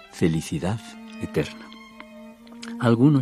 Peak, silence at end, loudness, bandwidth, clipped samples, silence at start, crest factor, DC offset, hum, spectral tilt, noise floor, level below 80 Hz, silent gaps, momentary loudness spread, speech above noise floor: -6 dBFS; 0 s; -25 LUFS; 14.5 kHz; under 0.1%; 0.15 s; 20 dB; under 0.1%; none; -7 dB/octave; -44 dBFS; -52 dBFS; none; 23 LU; 22 dB